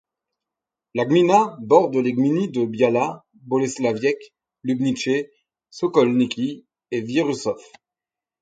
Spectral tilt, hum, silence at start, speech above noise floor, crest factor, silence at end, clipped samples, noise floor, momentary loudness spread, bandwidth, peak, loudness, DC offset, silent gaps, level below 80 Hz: -6 dB/octave; none; 0.95 s; 69 dB; 22 dB; 0.8 s; under 0.1%; -89 dBFS; 13 LU; 9.2 kHz; 0 dBFS; -21 LUFS; under 0.1%; none; -68 dBFS